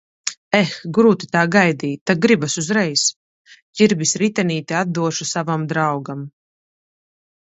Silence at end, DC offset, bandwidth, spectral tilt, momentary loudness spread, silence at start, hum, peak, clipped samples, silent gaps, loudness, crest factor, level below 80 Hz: 1.25 s; under 0.1%; 8.2 kHz; -4 dB/octave; 11 LU; 0.25 s; none; 0 dBFS; under 0.1%; 0.37-0.51 s, 2.01-2.06 s, 3.16-3.45 s, 3.62-3.73 s; -18 LUFS; 20 dB; -62 dBFS